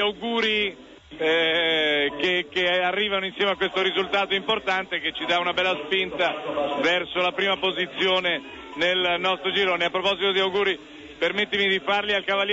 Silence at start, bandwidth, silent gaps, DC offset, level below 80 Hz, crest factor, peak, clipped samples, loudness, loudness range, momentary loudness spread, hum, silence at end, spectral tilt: 0 s; 8 kHz; none; under 0.1%; -60 dBFS; 12 dB; -12 dBFS; under 0.1%; -23 LUFS; 1 LU; 5 LU; none; 0 s; -4 dB/octave